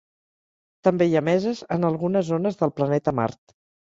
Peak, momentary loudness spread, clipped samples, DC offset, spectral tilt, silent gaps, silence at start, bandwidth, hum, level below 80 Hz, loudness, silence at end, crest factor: -4 dBFS; 5 LU; under 0.1%; under 0.1%; -8 dB/octave; none; 0.85 s; 7.8 kHz; none; -60 dBFS; -23 LUFS; 0.55 s; 18 dB